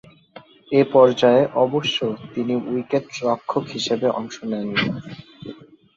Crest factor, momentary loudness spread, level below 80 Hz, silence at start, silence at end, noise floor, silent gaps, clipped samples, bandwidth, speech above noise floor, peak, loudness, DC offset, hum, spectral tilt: 20 dB; 18 LU; -62 dBFS; 0.35 s; 0.4 s; -46 dBFS; none; under 0.1%; 7.6 kHz; 26 dB; -2 dBFS; -20 LUFS; under 0.1%; none; -5.5 dB/octave